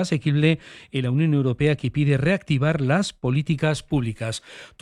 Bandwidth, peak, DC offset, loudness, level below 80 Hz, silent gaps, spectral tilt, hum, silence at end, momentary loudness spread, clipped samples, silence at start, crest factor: 11 kHz; -6 dBFS; under 0.1%; -22 LUFS; -48 dBFS; none; -6.5 dB/octave; none; 0.15 s; 9 LU; under 0.1%; 0 s; 16 dB